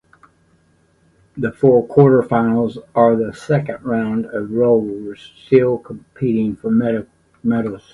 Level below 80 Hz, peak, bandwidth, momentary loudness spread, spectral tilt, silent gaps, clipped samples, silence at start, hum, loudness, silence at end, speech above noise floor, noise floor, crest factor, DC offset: -52 dBFS; 0 dBFS; 11 kHz; 13 LU; -9 dB/octave; none; under 0.1%; 1.35 s; none; -17 LUFS; 0.15 s; 41 dB; -57 dBFS; 16 dB; under 0.1%